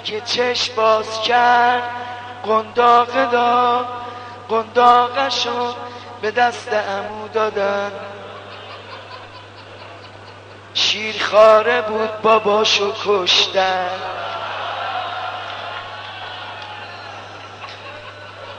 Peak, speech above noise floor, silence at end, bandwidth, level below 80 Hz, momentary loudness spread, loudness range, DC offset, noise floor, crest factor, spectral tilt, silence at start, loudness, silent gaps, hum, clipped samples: -2 dBFS; 22 dB; 0 s; 9.4 kHz; -64 dBFS; 21 LU; 12 LU; under 0.1%; -39 dBFS; 18 dB; -2.5 dB/octave; 0 s; -17 LUFS; none; none; under 0.1%